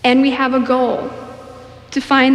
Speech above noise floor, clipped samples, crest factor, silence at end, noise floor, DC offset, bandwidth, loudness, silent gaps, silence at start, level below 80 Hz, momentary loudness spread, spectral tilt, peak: 23 dB; under 0.1%; 14 dB; 0 s; -37 dBFS; under 0.1%; 10 kHz; -16 LUFS; none; 0.05 s; -52 dBFS; 21 LU; -4.5 dB/octave; -2 dBFS